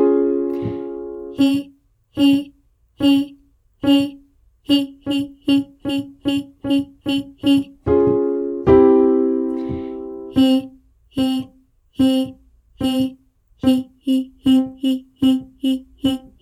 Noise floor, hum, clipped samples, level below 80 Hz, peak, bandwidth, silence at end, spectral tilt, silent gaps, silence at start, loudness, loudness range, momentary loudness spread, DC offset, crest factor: -56 dBFS; none; under 0.1%; -46 dBFS; -2 dBFS; 13.5 kHz; 0.2 s; -6.5 dB/octave; none; 0 s; -19 LUFS; 5 LU; 12 LU; under 0.1%; 18 dB